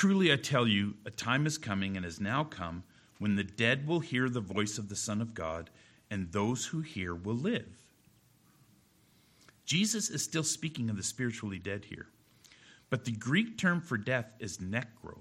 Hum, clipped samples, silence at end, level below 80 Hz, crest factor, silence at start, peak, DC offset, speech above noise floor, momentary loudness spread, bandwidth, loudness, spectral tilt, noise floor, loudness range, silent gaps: none; under 0.1%; 0 s; -64 dBFS; 22 dB; 0 s; -12 dBFS; under 0.1%; 33 dB; 13 LU; 16 kHz; -33 LUFS; -4 dB/octave; -66 dBFS; 5 LU; none